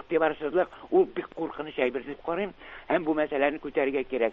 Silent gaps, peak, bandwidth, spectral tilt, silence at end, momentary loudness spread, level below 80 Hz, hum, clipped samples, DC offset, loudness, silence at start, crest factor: none; -10 dBFS; 4.2 kHz; -8 dB/octave; 0 s; 9 LU; -60 dBFS; none; under 0.1%; under 0.1%; -28 LUFS; 0.1 s; 18 dB